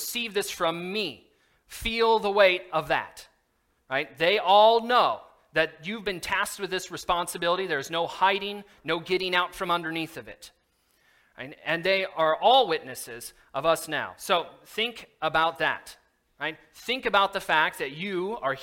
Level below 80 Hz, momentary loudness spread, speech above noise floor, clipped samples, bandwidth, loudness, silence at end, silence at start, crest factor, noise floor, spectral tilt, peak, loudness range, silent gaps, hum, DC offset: -58 dBFS; 15 LU; 45 dB; under 0.1%; 17 kHz; -26 LUFS; 0 s; 0 s; 22 dB; -71 dBFS; -3 dB/octave; -6 dBFS; 5 LU; none; none; under 0.1%